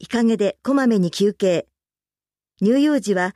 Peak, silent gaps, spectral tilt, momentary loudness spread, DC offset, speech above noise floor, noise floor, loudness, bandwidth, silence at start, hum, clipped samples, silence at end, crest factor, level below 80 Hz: -6 dBFS; none; -6 dB/octave; 4 LU; under 0.1%; over 72 dB; under -90 dBFS; -19 LUFS; 13.5 kHz; 0 s; none; under 0.1%; 0.05 s; 14 dB; -64 dBFS